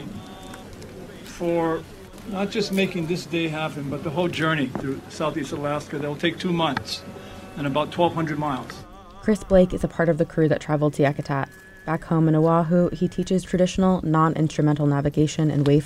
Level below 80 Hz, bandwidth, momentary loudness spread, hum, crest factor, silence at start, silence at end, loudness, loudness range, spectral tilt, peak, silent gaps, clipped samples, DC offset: -44 dBFS; 14 kHz; 19 LU; none; 18 dB; 0 s; 0 s; -23 LUFS; 5 LU; -6.5 dB/octave; -4 dBFS; none; under 0.1%; under 0.1%